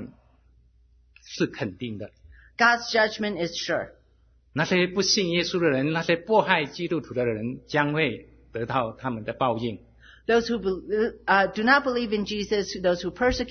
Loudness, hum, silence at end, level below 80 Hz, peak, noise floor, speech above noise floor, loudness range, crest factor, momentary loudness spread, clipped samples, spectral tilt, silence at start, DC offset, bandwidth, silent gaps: -25 LUFS; none; 0 s; -52 dBFS; -4 dBFS; -60 dBFS; 35 dB; 4 LU; 22 dB; 14 LU; under 0.1%; -4.5 dB/octave; 0 s; under 0.1%; 6.6 kHz; none